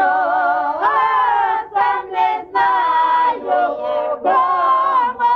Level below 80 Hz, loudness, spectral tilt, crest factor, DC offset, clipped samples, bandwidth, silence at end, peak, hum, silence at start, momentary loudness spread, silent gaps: -60 dBFS; -16 LUFS; -4.5 dB/octave; 10 dB; under 0.1%; under 0.1%; 6 kHz; 0 s; -6 dBFS; none; 0 s; 4 LU; none